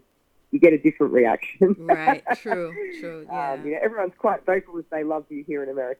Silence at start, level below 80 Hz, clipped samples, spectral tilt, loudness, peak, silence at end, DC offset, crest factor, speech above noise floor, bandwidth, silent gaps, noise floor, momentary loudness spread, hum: 0.55 s; -62 dBFS; under 0.1%; -8 dB/octave; -23 LUFS; -2 dBFS; 0.05 s; under 0.1%; 20 dB; 42 dB; 8.6 kHz; none; -64 dBFS; 14 LU; none